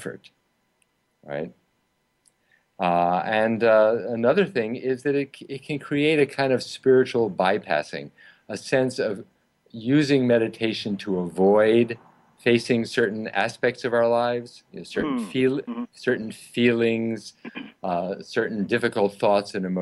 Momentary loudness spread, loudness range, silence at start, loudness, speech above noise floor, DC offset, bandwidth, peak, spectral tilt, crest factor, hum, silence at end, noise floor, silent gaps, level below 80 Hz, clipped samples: 15 LU; 3 LU; 0 s; -23 LUFS; 48 dB; under 0.1%; 12 kHz; -8 dBFS; -6 dB/octave; 16 dB; none; 0 s; -71 dBFS; none; -66 dBFS; under 0.1%